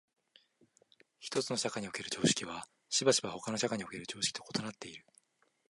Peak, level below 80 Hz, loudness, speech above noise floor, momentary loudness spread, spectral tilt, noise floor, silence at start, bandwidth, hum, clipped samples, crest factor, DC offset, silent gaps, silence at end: -14 dBFS; -74 dBFS; -34 LUFS; 35 dB; 16 LU; -3 dB/octave; -71 dBFS; 1.2 s; 11.5 kHz; none; under 0.1%; 22 dB; under 0.1%; none; 0.7 s